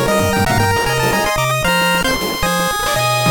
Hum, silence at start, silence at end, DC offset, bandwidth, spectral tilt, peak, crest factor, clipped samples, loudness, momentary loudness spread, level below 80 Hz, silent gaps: none; 0 s; 0 s; under 0.1%; over 20 kHz; -3.5 dB/octave; -2 dBFS; 14 dB; under 0.1%; -15 LUFS; 2 LU; -32 dBFS; none